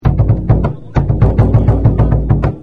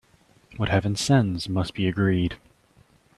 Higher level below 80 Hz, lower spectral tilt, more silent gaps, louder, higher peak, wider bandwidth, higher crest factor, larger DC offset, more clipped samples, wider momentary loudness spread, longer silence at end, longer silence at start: first, -16 dBFS vs -50 dBFS; first, -11 dB/octave vs -6 dB/octave; neither; first, -13 LUFS vs -24 LUFS; first, 0 dBFS vs -6 dBFS; second, 4.7 kHz vs 12.5 kHz; second, 10 dB vs 18 dB; first, 2% vs under 0.1%; neither; second, 5 LU vs 9 LU; second, 0 s vs 0.8 s; second, 0 s vs 0.5 s